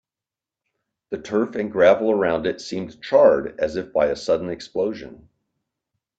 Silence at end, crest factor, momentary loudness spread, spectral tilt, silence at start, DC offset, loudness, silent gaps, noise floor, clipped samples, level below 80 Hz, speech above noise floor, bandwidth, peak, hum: 1.05 s; 20 dB; 14 LU; -5.5 dB/octave; 1.1 s; under 0.1%; -21 LUFS; none; -89 dBFS; under 0.1%; -56 dBFS; 69 dB; 8 kHz; -2 dBFS; none